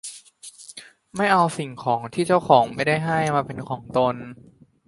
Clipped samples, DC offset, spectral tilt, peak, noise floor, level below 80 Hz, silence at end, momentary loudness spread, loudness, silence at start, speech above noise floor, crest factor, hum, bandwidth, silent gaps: under 0.1%; under 0.1%; -5.5 dB/octave; -2 dBFS; -45 dBFS; -58 dBFS; 0.55 s; 23 LU; -22 LUFS; 0.05 s; 24 dB; 22 dB; none; 11.5 kHz; none